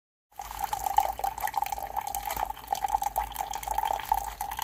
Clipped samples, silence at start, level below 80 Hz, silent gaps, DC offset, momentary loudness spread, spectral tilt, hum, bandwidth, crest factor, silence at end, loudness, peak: under 0.1%; 0.35 s; -48 dBFS; none; under 0.1%; 7 LU; -1.5 dB/octave; none; 16.5 kHz; 24 dB; 0 s; -31 LUFS; -8 dBFS